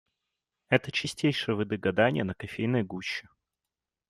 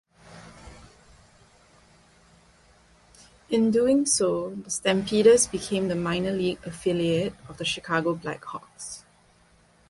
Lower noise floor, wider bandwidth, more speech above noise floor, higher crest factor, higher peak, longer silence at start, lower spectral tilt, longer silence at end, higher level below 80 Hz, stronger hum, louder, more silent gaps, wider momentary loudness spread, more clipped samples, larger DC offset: first, -89 dBFS vs -59 dBFS; first, 13.5 kHz vs 11.5 kHz; first, 60 dB vs 35 dB; about the same, 24 dB vs 20 dB; about the same, -6 dBFS vs -6 dBFS; first, 0.7 s vs 0.3 s; first, -5.5 dB/octave vs -4 dB/octave; about the same, 0.9 s vs 0.9 s; second, -66 dBFS vs -56 dBFS; neither; second, -29 LUFS vs -24 LUFS; neither; second, 9 LU vs 18 LU; neither; neither